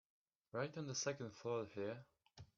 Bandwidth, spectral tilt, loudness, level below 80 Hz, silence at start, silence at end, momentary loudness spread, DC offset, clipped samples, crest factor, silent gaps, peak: 7.4 kHz; -4.5 dB/octave; -46 LUFS; -82 dBFS; 0.55 s; 0.1 s; 9 LU; under 0.1%; under 0.1%; 20 dB; none; -28 dBFS